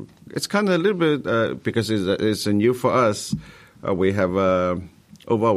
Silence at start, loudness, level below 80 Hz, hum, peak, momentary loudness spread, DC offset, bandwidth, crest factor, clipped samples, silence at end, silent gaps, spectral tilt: 0 s; -21 LUFS; -54 dBFS; none; -6 dBFS; 10 LU; under 0.1%; 15 kHz; 14 dB; under 0.1%; 0 s; none; -5.5 dB/octave